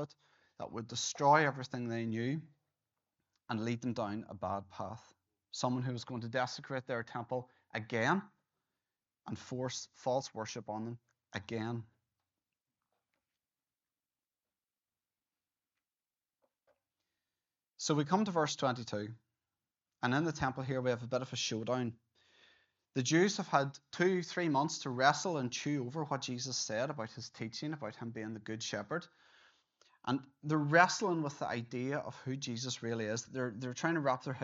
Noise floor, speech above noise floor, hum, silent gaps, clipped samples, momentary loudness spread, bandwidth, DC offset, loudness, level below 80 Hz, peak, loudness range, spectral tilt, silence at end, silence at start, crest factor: under -90 dBFS; over 54 dB; none; none; under 0.1%; 13 LU; 7.6 kHz; under 0.1%; -36 LUFS; -76 dBFS; -12 dBFS; 8 LU; -4 dB/octave; 0 s; 0 s; 26 dB